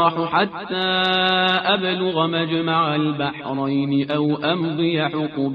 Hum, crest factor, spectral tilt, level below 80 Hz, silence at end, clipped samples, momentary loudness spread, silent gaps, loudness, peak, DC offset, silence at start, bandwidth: none; 16 dB; -7.5 dB/octave; -62 dBFS; 0 s; under 0.1%; 6 LU; none; -20 LUFS; -4 dBFS; under 0.1%; 0 s; 6 kHz